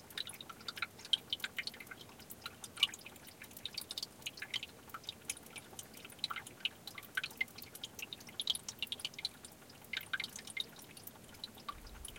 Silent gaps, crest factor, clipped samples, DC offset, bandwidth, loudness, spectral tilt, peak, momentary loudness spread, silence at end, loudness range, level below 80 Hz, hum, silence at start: none; 30 dB; under 0.1%; under 0.1%; 17 kHz; -42 LUFS; -0.5 dB/octave; -14 dBFS; 16 LU; 0 s; 4 LU; -68 dBFS; none; 0 s